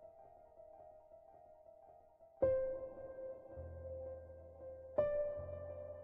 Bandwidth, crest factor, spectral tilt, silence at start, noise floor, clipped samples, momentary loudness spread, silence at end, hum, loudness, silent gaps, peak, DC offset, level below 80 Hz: 3.2 kHz; 22 dB; -8.5 dB/octave; 0 s; -64 dBFS; under 0.1%; 25 LU; 0 s; none; -43 LUFS; none; -22 dBFS; under 0.1%; -62 dBFS